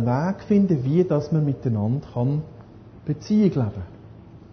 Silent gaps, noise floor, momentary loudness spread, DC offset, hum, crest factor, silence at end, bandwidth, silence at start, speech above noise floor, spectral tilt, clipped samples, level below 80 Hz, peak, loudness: none; -44 dBFS; 13 LU; under 0.1%; none; 16 dB; 0.15 s; 6.4 kHz; 0 s; 23 dB; -9.5 dB/octave; under 0.1%; -48 dBFS; -8 dBFS; -23 LUFS